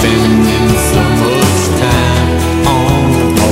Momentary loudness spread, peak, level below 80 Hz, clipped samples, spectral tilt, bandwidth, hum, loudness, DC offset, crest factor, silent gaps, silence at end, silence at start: 2 LU; 0 dBFS; -22 dBFS; under 0.1%; -5 dB/octave; 16.5 kHz; none; -10 LUFS; under 0.1%; 10 dB; none; 0 s; 0 s